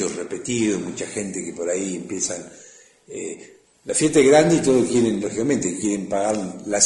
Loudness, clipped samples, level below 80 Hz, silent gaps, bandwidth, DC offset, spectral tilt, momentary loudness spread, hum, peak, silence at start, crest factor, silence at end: -21 LUFS; under 0.1%; -58 dBFS; none; 11.5 kHz; under 0.1%; -4 dB/octave; 18 LU; none; -4 dBFS; 0 s; 18 dB; 0 s